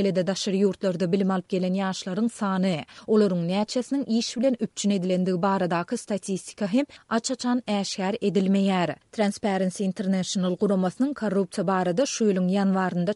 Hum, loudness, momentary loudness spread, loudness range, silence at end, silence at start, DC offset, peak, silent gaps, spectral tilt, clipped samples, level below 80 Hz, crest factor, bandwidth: none; -25 LUFS; 5 LU; 1 LU; 0 s; 0 s; under 0.1%; -10 dBFS; none; -5.5 dB/octave; under 0.1%; -68 dBFS; 14 dB; 11.5 kHz